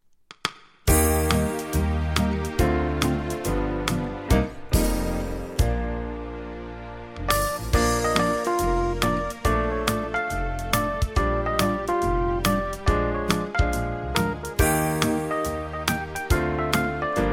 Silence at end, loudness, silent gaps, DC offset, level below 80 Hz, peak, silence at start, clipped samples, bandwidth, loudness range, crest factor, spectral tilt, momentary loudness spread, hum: 0 s; -25 LUFS; none; under 0.1%; -30 dBFS; -2 dBFS; 0.45 s; under 0.1%; 17 kHz; 3 LU; 22 dB; -5 dB/octave; 8 LU; none